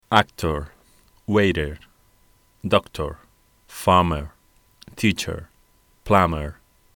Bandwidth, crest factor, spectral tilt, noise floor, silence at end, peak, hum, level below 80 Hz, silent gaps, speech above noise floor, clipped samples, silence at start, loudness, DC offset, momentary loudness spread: over 20 kHz; 24 dB; -5.5 dB/octave; -59 dBFS; 0.45 s; 0 dBFS; none; -40 dBFS; none; 38 dB; under 0.1%; 0.1 s; -22 LUFS; under 0.1%; 22 LU